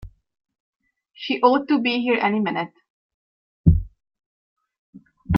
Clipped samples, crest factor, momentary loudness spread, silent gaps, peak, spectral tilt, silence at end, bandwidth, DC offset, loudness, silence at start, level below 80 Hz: under 0.1%; 22 dB; 14 LU; 0.60-0.73 s, 2.90-3.64 s, 4.26-4.56 s, 4.78-4.93 s; -2 dBFS; -9 dB/octave; 0 s; 5.8 kHz; under 0.1%; -21 LUFS; 0 s; -36 dBFS